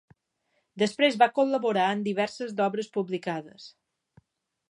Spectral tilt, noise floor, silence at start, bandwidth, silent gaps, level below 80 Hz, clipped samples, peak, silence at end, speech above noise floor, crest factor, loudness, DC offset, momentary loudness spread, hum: -5 dB/octave; -75 dBFS; 0.75 s; 11 kHz; none; -78 dBFS; under 0.1%; -6 dBFS; 1 s; 49 dB; 22 dB; -26 LUFS; under 0.1%; 10 LU; none